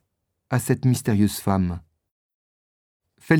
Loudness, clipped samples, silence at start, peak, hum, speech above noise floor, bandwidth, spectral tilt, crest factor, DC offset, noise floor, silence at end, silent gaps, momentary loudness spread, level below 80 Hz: -23 LUFS; under 0.1%; 0.5 s; -4 dBFS; none; 55 dB; 19 kHz; -6.5 dB/octave; 20 dB; under 0.1%; -76 dBFS; 0 s; 2.11-3.00 s; 7 LU; -52 dBFS